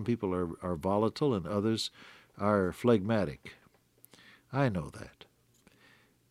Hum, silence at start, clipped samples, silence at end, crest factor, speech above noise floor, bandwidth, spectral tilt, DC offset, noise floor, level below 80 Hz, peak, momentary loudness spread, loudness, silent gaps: none; 0 s; under 0.1%; 1.2 s; 20 dB; 34 dB; 15 kHz; -6.5 dB/octave; under 0.1%; -65 dBFS; -62 dBFS; -12 dBFS; 19 LU; -31 LUFS; none